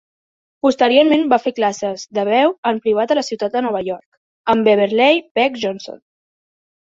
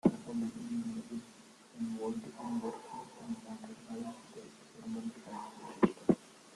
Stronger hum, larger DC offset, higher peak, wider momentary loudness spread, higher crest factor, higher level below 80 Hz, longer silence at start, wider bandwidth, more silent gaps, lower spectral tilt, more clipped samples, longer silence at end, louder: neither; neither; first, -2 dBFS vs -12 dBFS; second, 11 LU vs 17 LU; second, 16 dB vs 26 dB; first, -62 dBFS vs -72 dBFS; first, 0.65 s vs 0.05 s; second, 7.8 kHz vs 12 kHz; first, 2.58-2.63 s, 4.06-4.44 s, 5.31-5.35 s vs none; second, -4.5 dB/octave vs -7 dB/octave; neither; first, 0.9 s vs 0 s; first, -16 LUFS vs -39 LUFS